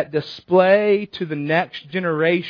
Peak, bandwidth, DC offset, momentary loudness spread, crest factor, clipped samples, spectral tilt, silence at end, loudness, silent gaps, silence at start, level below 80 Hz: -2 dBFS; 5.4 kHz; under 0.1%; 11 LU; 18 dB; under 0.1%; -8 dB/octave; 0 s; -19 LUFS; none; 0 s; -66 dBFS